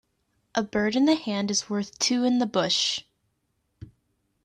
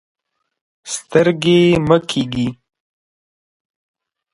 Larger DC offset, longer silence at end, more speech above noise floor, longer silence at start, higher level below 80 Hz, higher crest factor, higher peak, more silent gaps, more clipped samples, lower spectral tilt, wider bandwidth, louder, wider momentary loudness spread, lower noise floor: neither; second, 0.6 s vs 1.8 s; second, 50 dB vs over 75 dB; second, 0.55 s vs 0.85 s; second, -64 dBFS vs -48 dBFS; about the same, 18 dB vs 18 dB; second, -10 dBFS vs 0 dBFS; neither; neither; second, -3 dB/octave vs -5.5 dB/octave; about the same, 10.5 kHz vs 11.5 kHz; second, -25 LUFS vs -15 LUFS; second, 8 LU vs 12 LU; second, -74 dBFS vs under -90 dBFS